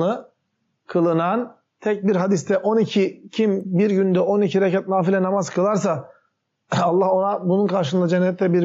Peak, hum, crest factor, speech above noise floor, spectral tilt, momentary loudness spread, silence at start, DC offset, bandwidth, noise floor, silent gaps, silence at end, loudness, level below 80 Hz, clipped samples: -8 dBFS; none; 12 dB; 53 dB; -6.5 dB/octave; 7 LU; 0 s; under 0.1%; 8 kHz; -72 dBFS; none; 0 s; -20 LUFS; -72 dBFS; under 0.1%